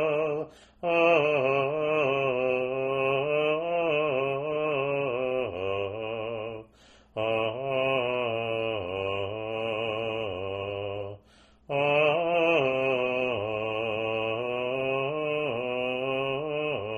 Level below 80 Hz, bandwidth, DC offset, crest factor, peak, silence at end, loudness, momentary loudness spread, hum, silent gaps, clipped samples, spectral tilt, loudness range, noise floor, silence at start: -62 dBFS; 10.5 kHz; under 0.1%; 18 dB; -10 dBFS; 0 s; -28 LUFS; 9 LU; none; none; under 0.1%; -6.5 dB/octave; 5 LU; -58 dBFS; 0 s